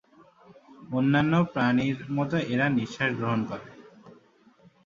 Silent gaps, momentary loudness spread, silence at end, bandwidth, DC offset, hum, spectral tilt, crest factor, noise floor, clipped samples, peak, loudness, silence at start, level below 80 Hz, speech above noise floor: none; 7 LU; 0.75 s; 7.4 kHz; under 0.1%; none; -7.5 dB/octave; 18 dB; -59 dBFS; under 0.1%; -8 dBFS; -26 LUFS; 0.5 s; -62 dBFS; 33 dB